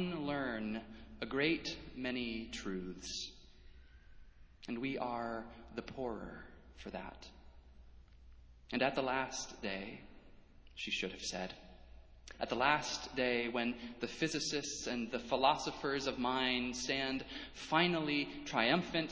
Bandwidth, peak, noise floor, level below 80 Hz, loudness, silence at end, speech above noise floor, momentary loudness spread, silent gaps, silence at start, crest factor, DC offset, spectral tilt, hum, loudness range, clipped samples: 8 kHz; -14 dBFS; -58 dBFS; -60 dBFS; -38 LUFS; 0 s; 21 dB; 16 LU; none; 0 s; 24 dB; under 0.1%; -3.5 dB/octave; none; 9 LU; under 0.1%